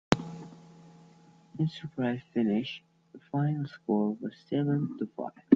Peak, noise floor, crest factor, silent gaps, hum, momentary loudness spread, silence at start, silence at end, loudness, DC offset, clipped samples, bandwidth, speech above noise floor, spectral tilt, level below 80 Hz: -2 dBFS; -58 dBFS; 28 dB; none; none; 15 LU; 0.1 s; 0 s; -32 LUFS; under 0.1%; under 0.1%; 9 kHz; 28 dB; -7.5 dB/octave; -62 dBFS